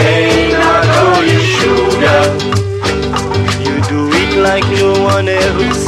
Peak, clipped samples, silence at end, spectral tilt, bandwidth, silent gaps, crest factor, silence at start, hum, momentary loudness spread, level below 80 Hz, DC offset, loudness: 0 dBFS; under 0.1%; 0 s; -5 dB/octave; 14.5 kHz; none; 10 dB; 0 s; none; 6 LU; -30 dBFS; under 0.1%; -11 LUFS